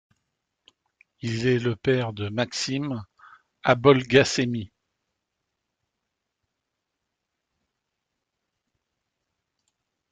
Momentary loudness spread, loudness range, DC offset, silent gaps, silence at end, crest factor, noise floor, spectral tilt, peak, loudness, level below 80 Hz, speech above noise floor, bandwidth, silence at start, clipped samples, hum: 15 LU; 5 LU; under 0.1%; none; 5.45 s; 24 dB; -82 dBFS; -5 dB/octave; -4 dBFS; -23 LUFS; -60 dBFS; 60 dB; 9.4 kHz; 1.25 s; under 0.1%; none